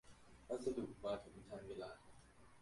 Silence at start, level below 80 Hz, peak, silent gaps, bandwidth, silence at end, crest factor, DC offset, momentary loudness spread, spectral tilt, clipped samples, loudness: 0.05 s; -70 dBFS; -30 dBFS; none; 11.5 kHz; 0 s; 20 dB; under 0.1%; 22 LU; -6 dB/octave; under 0.1%; -48 LUFS